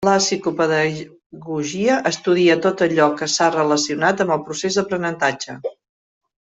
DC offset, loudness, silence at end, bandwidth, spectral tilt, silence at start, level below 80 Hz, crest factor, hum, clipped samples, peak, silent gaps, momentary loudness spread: under 0.1%; -19 LUFS; 0.85 s; 8.4 kHz; -4 dB/octave; 0 s; -62 dBFS; 16 dB; none; under 0.1%; -2 dBFS; 1.26-1.30 s; 12 LU